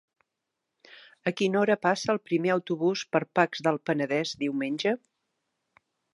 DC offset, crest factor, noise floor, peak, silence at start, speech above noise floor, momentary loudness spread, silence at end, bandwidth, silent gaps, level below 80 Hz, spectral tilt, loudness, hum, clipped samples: under 0.1%; 22 dB; -84 dBFS; -6 dBFS; 0.9 s; 57 dB; 6 LU; 1.2 s; 11.5 kHz; none; -76 dBFS; -5.5 dB/octave; -27 LUFS; none; under 0.1%